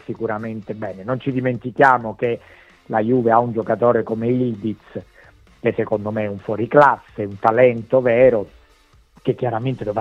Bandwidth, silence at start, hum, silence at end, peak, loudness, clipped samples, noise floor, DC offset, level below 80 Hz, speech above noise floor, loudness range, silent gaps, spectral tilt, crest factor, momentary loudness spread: 7.4 kHz; 0.1 s; none; 0 s; 0 dBFS; -19 LUFS; under 0.1%; -53 dBFS; under 0.1%; -54 dBFS; 35 dB; 4 LU; none; -9 dB/octave; 18 dB; 14 LU